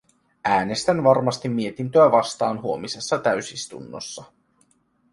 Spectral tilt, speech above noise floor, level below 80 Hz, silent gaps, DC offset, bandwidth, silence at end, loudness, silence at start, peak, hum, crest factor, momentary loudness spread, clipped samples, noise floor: -5 dB/octave; 43 dB; -60 dBFS; none; under 0.1%; 11.5 kHz; 0.9 s; -21 LUFS; 0.45 s; -4 dBFS; none; 20 dB; 17 LU; under 0.1%; -64 dBFS